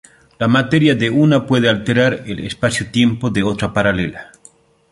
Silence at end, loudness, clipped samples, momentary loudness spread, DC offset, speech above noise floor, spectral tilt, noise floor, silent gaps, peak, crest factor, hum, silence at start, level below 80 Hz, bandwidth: 0.65 s; -16 LUFS; under 0.1%; 8 LU; under 0.1%; 33 dB; -6 dB/octave; -49 dBFS; none; 0 dBFS; 16 dB; none; 0.4 s; -44 dBFS; 11.5 kHz